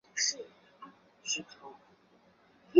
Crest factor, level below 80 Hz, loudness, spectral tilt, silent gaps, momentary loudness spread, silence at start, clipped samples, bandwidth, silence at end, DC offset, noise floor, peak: 26 dB; -84 dBFS; -34 LUFS; -1 dB/octave; none; 23 LU; 0.15 s; under 0.1%; 7.4 kHz; 0 s; under 0.1%; -65 dBFS; -10 dBFS